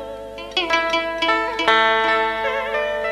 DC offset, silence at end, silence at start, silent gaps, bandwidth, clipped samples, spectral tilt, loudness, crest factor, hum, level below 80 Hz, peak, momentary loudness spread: under 0.1%; 0 s; 0 s; none; 13.5 kHz; under 0.1%; -2.5 dB/octave; -19 LUFS; 20 dB; 50 Hz at -45 dBFS; -48 dBFS; 0 dBFS; 8 LU